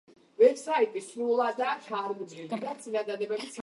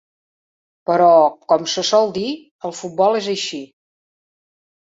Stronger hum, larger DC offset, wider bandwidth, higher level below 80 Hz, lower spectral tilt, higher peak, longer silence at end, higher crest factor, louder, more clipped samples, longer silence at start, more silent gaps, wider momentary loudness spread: neither; neither; first, 11.5 kHz vs 8 kHz; second, -86 dBFS vs -64 dBFS; about the same, -4 dB/octave vs -3.5 dB/octave; second, -10 dBFS vs -2 dBFS; second, 0 s vs 1.2 s; about the same, 20 dB vs 18 dB; second, -29 LUFS vs -17 LUFS; neither; second, 0.4 s vs 0.9 s; second, none vs 2.51-2.59 s; second, 12 LU vs 16 LU